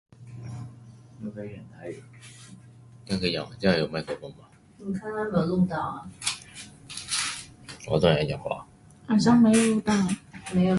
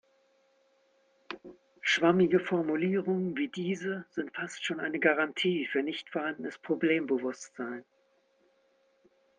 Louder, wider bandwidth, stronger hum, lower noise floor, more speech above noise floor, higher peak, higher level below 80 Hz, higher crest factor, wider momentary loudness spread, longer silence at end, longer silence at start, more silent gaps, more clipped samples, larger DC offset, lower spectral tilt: first, -26 LUFS vs -30 LUFS; first, 11.5 kHz vs 9.6 kHz; neither; second, -50 dBFS vs -70 dBFS; second, 25 dB vs 40 dB; first, -6 dBFS vs -12 dBFS; first, -54 dBFS vs -78 dBFS; about the same, 20 dB vs 20 dB; first, 22 LU vs 14 LU; second, 0 s vs 1.55 s; second, 0.2 s vs 1.3 s; neither; neither; neither; about the same, -5 dB/octave vs -5.5 dB/octave